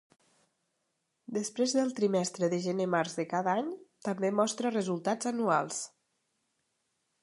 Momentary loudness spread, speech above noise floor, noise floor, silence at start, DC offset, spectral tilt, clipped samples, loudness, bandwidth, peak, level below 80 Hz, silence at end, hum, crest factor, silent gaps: 9 LU; 50 dB; -80 dBFS; 1.3 s; under 0.1%; -4.5 dB/octave; under 0.1%; -31 LUFS; 11.5 kHz; -14 dBFS; -82 dBFS; 1.35 s; none; 18 dB; none